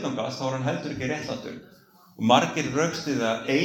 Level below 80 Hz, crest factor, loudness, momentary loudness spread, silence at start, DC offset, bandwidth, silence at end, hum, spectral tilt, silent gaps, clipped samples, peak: -62 dBFS; 22 dB; -26 LUFS; 13 LU; 0 s; under 0.1%; 18 kHz; 0 s; none; -4.5 dB/octave; none; under 0.1%; -4 dBFS